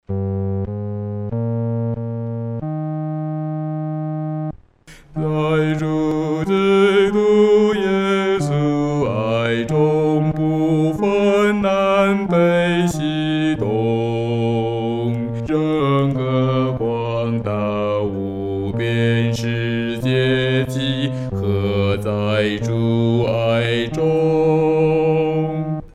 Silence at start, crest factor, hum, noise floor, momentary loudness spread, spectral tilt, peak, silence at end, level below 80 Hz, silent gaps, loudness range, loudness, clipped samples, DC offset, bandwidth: 0.1 s; 14 dB; none; -45 dBFS; 9 LU; -7.5 dB/octave; -4 dBFS; 0.05 s; -44 dBFS; none; 8 LU; -19 LUFS; under 0.1%; under 0.1%; 13 kHz